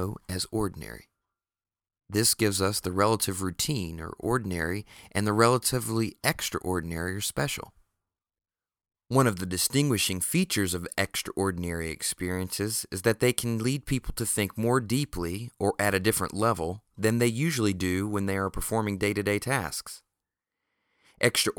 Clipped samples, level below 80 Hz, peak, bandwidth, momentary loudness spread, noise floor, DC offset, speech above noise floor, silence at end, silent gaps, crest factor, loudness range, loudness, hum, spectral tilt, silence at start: under 0.1%; -50 dBFS; -4 dBFS; over 20 kHz; 9 LU; under -90 dBFS; under 0.1%; over 62 dB; 0.05 s; none; 24 dB; 3 LU; -28 LUFS; none; -4 dB/octave; 0 s